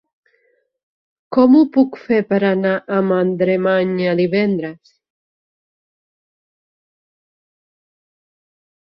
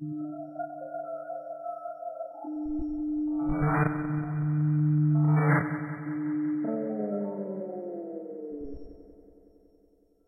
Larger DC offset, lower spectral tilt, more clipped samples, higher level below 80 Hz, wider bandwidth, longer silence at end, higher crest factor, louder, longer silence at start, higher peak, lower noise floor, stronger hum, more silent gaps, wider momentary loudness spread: neither; second, -10 dB/octave vs -12.5 dB/octave; neither; second, -62 dBFS vs -52 dBFS; first, 5.8 kHz vs 2.6 kHz; first, 4.05 s vs 1.05 s; about the same, 16 dB vs 20 dB; first, -16 LUFS vs -30 LUFS; first, 1.3 s vs 0 s; first, -2 dBFS vs -10 dBFS; about the same, -63 dBFS vs -64 dBFS; neither; neither; second, 8 LU vs 15 LU